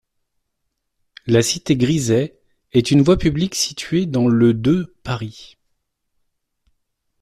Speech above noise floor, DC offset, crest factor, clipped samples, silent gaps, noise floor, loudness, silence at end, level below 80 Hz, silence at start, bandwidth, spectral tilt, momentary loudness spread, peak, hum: 57 dB; under 0.1%; 16 dB; under 0.1%; none; -74 dBFS; -18 LUFS; 1.75 s; -42 dBFS; 1.25 s; 14 kHz; -5.5 dB/octave; 12 LU; -2 dBFS; none